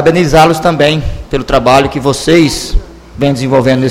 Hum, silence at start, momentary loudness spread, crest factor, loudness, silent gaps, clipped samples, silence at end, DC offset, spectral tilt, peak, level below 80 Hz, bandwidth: none; 0 s; 10 LU; 10 dB; -10 LUFS; none; 1%; 0 s; under 0.1%; -5.5 dB/octave; 0 dBFS; -22 dBFS; 16.5 kHz